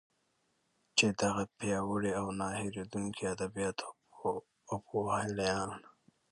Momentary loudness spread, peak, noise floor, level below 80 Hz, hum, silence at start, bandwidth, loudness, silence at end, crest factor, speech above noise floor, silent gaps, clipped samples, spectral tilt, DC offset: 12 LU; -14 dBFS; -77 dBFS; -62 dBFS; none; 0.95 s; 11.5 kHz; -35 LUFS; 0.45 s; 22 dB; 42 dB; none; under 0.1%; -4 dB/octave; under 0.1%